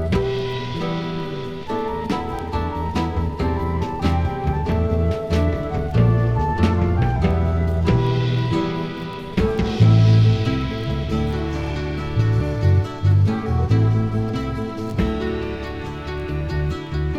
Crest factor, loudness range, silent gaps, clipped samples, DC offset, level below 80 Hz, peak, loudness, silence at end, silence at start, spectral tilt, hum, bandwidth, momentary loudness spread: 16 dB; 5 LU; none; under 0.1%; under 0.1%; -30 dBFS; -2 dBFS; -21 LUFS; 0 s; 0 s; -8 dB/octave; none; 7.6 kHz; 9 LU